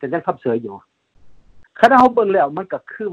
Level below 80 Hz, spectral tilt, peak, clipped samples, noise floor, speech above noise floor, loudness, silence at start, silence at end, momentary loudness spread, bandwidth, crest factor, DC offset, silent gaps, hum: -56 dBFS; -6.5 dB/octave; 0 dBFS; under 0.1%; -46 dBFS; 29 dB; -16 LUFS; 0 s; 0 s; 16 LU; 11.5 kHz; 18 dB; under 0.1%; none; none